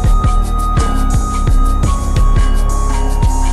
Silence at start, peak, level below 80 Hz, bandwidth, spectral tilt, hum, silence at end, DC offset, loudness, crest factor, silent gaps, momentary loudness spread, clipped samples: 0 s; -4 dBFS; -12 dBFS; 12.5 kHz; -6 dB/octave; none; 0 s; under 0.1%; -16 LUFS; 8 dB; none; 2 LU; under 0.1%